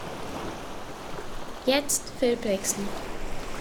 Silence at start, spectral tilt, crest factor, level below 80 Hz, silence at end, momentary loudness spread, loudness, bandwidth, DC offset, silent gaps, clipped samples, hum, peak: 0 s; -3 dB/octave; 20 dB; -42 dBFS; 0 s; 13 LU; -29 LUFS; 19.5 kHz; under 0.1%; none; under 0.1%; none; -10 dBFS